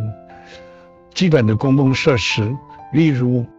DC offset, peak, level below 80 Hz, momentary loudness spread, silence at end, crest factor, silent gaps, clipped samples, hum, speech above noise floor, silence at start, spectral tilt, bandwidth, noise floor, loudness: under 0.1%; -2 dBFS; -50 dBFS; 14 LU; 0.1 s; 16 dB; none; under 0.1%; none; 28 dB; 0 s; -6.5 dB/octave; 8 kHz; -44 dBFS; -16 LUFS